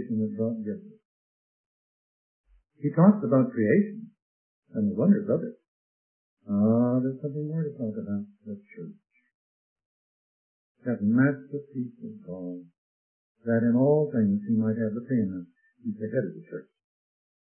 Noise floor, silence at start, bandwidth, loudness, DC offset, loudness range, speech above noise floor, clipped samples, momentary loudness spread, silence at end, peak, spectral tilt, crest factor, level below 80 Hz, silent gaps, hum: under -90 dBFS; 0 s; 2.6 kHz; -26 LUFS; under 0.1%; 8 LU; over 64 dB; under 0.1%; 18 LU; 0.9 s; -6 dBFS; -15 dB/octave; 22 dB; -74 dBFS; 1.05-2.44 s, 4.22-4.63 s, 5.68-6.37 s, 9.34-9.76 s, 9.86-10.75 s, 12.78-13.35 s; none